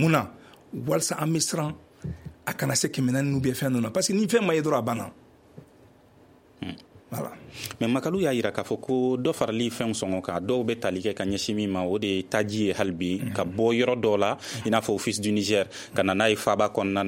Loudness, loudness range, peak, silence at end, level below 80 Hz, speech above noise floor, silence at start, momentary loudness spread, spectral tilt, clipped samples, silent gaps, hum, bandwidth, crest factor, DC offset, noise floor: -26 LUFS; 6 LU; -6 dBFS; 0 s; -58 dBFS; 30 dB; 0 s; 14 LU; -4.5 dB/octave; under 0.1%; none; none; 16.5 kHz; 20 dB; under 0.1%; -55 dBFS